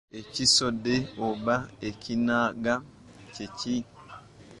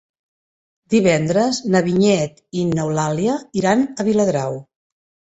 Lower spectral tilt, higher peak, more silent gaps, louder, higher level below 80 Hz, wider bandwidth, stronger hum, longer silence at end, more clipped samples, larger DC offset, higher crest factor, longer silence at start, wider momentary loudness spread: second, -3 dB/octave vs -5.5 dB/octave; second, -10 dBFS vs -2 dBFS; neither; second, -27 LUFS vs -18 LUFS; about the same, -58 dBFS vs -54 dBFS; first, 11.5 kHz vs 8.2 kHz; neither; second, 0 s vs 0.75 s; neither; neither; about the same, 20 dB vs 18 dB; second, 0.15 s vs 0.9 s; first, 23 LU vs 7 LU